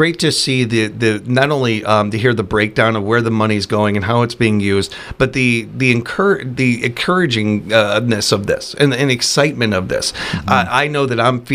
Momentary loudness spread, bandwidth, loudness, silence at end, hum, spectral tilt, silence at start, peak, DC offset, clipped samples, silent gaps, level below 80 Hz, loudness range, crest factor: 4 LU; 16 kHz; -15 LUFS; 0 s; none; -5 dB/octave; 0 s; 0 dBFS; under 0.1%; under 0.1%; none; -44 dBFS; 1 LU; 16 dB